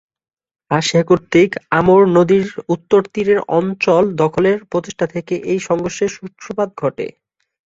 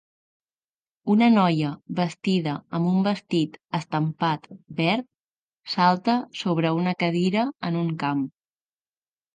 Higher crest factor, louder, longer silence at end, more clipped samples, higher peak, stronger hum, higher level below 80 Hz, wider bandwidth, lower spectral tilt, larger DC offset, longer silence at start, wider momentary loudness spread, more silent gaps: second, 14 dB vs 20 dB; first, -16 LUFS vs -24 LUFS; second, 0.65 s vs 1.05 s; neither; first, -2 dBFS vs -6 dBFS; neither; first, -52 dBFS vs -72 dBFS; second, 8 kHz vs 9.4 kHz; about the same, -6 dB/octave vs -7 dB/octave; neither; second, 0.7 s vs 1.05 s; about the same, 11 LU vs 9 LU; second, none vs 5.20-5.30 s, 5.38-5.49 s